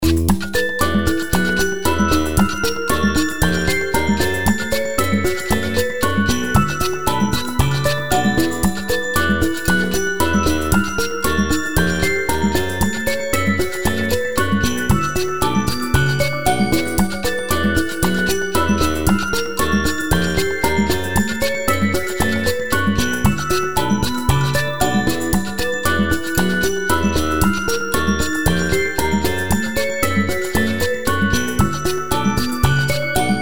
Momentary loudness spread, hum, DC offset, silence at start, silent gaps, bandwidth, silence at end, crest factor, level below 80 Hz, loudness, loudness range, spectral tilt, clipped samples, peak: 3 LU; none; 5%; 0 s; none; over 20 kHz; 0 s; 18 dB; -30 dBFS; -18 LUFS; 1 LU; -4.5 dB/octave; under 0.1%; -2 dBFS